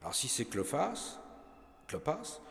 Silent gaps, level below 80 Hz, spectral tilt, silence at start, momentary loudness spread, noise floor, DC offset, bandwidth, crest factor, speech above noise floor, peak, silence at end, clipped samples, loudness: none; -64 dBFS; -3 dB/octave; 0 s; 22 LU; -57 dBFS; under 0.1%; 16 kHz; 20 dB; 21 dB; -18 dBFS; 0 s; under 0.1%; -36 LUFS